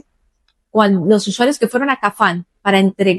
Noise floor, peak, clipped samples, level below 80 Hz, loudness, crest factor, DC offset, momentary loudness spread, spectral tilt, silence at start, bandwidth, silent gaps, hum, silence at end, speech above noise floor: -63 dBFS; 0 dBFS; under 0.1%; -62 dBFS; -15 LUFS; 16 dB; under 0.1%; 4 LU; -5.5 dB/octave; 0.75 s; 12.5 kHz; none; none; 0 s; 49 dB